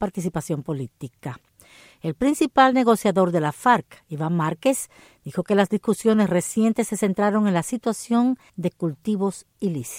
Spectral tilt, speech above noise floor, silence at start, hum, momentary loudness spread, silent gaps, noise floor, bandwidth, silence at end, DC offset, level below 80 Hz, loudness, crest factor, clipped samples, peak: -5.5 dB/octave; 29 dB; 0 s; none; 13 LU; none; -51 dBFS; 16.5 kHz; 0 s; under 0.1%; -58 dBFS; -22 LUFS; 18 dB; under 0.1%; -4 dBFS